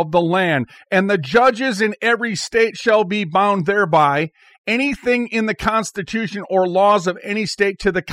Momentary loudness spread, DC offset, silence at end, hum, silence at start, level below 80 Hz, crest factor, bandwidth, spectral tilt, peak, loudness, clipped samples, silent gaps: 7 LU; under 0.1%; 0 s; none; 0 s; -48 dBFS; 14 dB; 15 kHz; -5 dB/octave; -4 dBFS; -18 LUFS; under 0.1%; 4.58-4.64 s